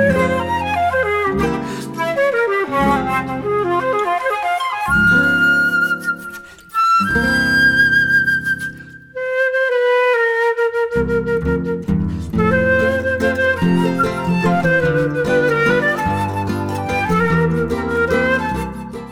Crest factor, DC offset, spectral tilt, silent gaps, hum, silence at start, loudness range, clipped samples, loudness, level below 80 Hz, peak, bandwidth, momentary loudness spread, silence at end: 14 dB; under 0.1%; -6 dB/octave; none; none; 0 s; 3 LU; under 0.1%; -16 LUFS; -38 dBFS; -4 dBFS; 16.5 kHz; 9 LU; 0 s